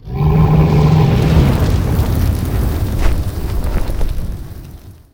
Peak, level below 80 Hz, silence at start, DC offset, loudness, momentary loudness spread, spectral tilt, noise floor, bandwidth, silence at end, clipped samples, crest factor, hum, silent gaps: 0 dBFS; -18 dBFS; 0.05 s; under 0.1%; -15 LUFS; 13 LU; -7.5 dB/octave; -35 dBFS; 17 kHz; 0.2 s; under 0.1%; 14 dB; none; none